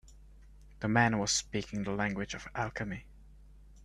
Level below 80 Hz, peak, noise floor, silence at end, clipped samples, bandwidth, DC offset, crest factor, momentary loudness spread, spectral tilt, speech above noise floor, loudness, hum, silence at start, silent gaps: -54 dBFS; -12 dBFS; -55 dBFS; 0 s; under 0.1%; 12.5 kHz; under 0.1%; 24 dB; 12 LU; -4 dB/octave; 22 dB; -33 LUFS; none; 0.05 s; none